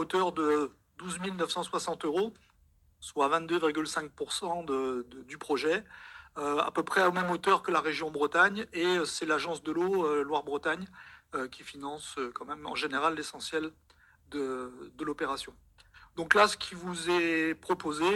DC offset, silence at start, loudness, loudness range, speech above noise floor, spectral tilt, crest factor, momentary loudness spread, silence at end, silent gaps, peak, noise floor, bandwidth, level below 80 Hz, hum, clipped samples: under 0.1%; 0 s; -31 LUFS; 7 LU; 34 dB; -3.5 dB/octave; 24 dB; 14 LU; 0 s; none; -6 dBFS; -65 dBFS; 16 kHz; -66 dBFS; none; under 0.1%